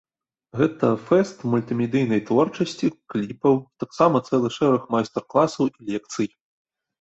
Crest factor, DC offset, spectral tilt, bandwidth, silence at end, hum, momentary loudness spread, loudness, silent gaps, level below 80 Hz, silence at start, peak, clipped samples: 18 dB; under 0.1%; -7 dB/octave; 8.2 kHz; 0.75 s; none; 9 LU; -22 LUFS; none; -62 dBFS; 0.55 s; -4 dBFS; under 0.1%